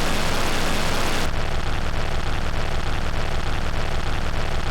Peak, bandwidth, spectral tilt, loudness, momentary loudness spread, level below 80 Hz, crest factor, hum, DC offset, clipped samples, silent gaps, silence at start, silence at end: -12 dBFS; 15.5 kHz; -4 dB/octave; -26 LUFS; 4 LU; -24 dBFS; 8 dB; none; under 0.1%; under 0.1%; none; 0 s; 0 s